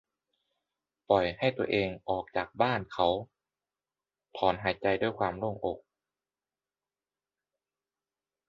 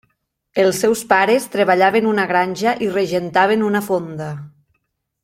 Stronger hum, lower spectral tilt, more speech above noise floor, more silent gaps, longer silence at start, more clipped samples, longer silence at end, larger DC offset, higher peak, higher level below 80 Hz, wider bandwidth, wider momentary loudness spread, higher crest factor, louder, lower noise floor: first, 50 Hz at -70 dBFS vs none; first, -7.5 dB/octave vs -4.5 dB/octave; first, over 60 dB vs 55 dB; neither; first, 1.1 s vs 0.55 s; neither; first, 2.7 s vs 0.75 s; neither; second, -10 dBFS vs 0 dBFS; about the same, -60 dBFS vs -60 dBFS; second, 7.4 kHz vs 16.5 kHz; second, 8 LU vs 11 LU; first, 22 dB vs 16 dB; second, -30 LUFS vs -17 LUFS; first, under -90 dBFS vs -71 dBFS